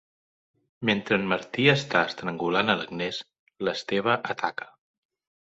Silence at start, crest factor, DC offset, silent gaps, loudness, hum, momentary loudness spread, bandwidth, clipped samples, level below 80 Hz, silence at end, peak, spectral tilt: 0.8 s; 24 dB; under 0.1%; 3.39-3.46 s; -26 LUFS; none; 10 LU; 8 kHz; under 0.1%; -64 dBFS; 0.85 s; -4 dBFS; -5.5 dB/octave